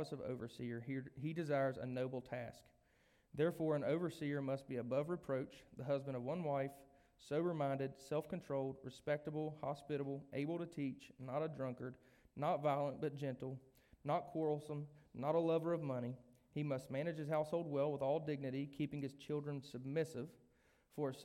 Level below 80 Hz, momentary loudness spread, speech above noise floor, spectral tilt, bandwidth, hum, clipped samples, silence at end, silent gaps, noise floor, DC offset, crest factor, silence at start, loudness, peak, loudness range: -76 dBFS; 10 LU; 33 dB; -7.5 dB/octave; 16 kHz; none; under 0.1%; 0 s; none; -75 dBFS; under 0.1%; 18 dB; 0 s; -43 LUFS; -26 dBFS; 3 LU